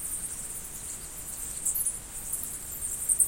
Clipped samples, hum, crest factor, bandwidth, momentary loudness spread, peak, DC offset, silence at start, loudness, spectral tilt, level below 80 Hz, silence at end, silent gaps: under 0.1%; none; 24 dB; 17 kHz; 9 LU; -8 dBFS; under 0.1%; 0 s; -32 LUFS; -0.5 dB/octave; -50 dBFS; 0 s; none